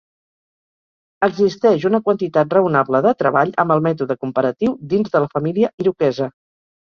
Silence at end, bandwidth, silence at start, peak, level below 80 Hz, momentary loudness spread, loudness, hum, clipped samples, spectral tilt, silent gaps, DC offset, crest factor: 0.5 s; 6.8 kHz; 1.2 s; -2 dBFS; -60 dBFS; 5 LU; -18 LUFS; none; under 0.1%; -8 dB/octave; 5.74-5.78 s; under 0.1%; 16 dB